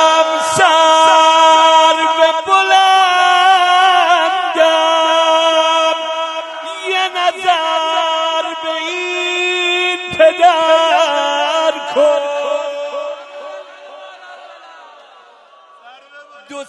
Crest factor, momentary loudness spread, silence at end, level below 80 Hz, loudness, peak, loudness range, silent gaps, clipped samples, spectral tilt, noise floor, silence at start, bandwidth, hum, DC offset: 14 dB; 13 LU; 0.05 s; -64 dBFS; -12 LUFS; 0 dBFS; 11 LU; none; under 0.1%; -1 dB/octave; -44 dBFS; 0 s; 11.5 kHz; none; under 0.1%